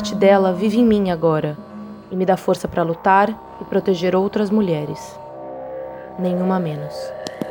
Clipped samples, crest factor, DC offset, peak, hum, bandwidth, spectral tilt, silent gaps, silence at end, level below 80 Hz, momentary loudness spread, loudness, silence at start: under 0.1%; 18 dB; under 0.1%; -2 dBFS; none; 20 kHz; -7 dB/octave; none; 0 s; -50 dBFS; 17 LU; -19 LUFS; 0 s